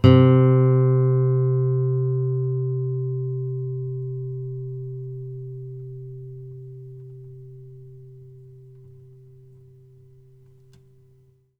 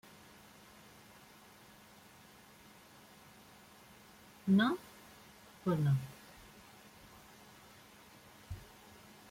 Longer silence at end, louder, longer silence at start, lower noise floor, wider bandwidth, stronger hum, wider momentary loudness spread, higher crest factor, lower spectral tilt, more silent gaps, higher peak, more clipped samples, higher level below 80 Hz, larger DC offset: first, 3 s vs 0.7 s; first, -22 LUFS vs -35 LUFS; second, 0.05 s vs 4.45 s; about the same, -57 dBFS vs -59 dBFS; second, 5 kHz vs 16.5 kHz; neither; about the same, 25 LU vs 25 LU; about the same, 22 dB vs 22 dB; first, -10.5 dB/octave vs -6.5 dB/octave; neither; first, -2 dBFS vs -20 dBFS; neither; first, -52 dBFS vs -68 dBFS; neither